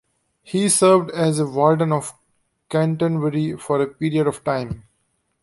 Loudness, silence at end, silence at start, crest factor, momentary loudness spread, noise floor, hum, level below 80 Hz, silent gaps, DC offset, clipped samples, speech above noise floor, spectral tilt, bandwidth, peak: -20 LUFS; 0.65 s; 0.5 s; 18 dB; 10 LU; -69 dBFS; none; -54 dBFS; none; under 0.1%; under 0.1%; 50 dB; -5.5 dB/octave; 11.5 kHz; -2 dBFS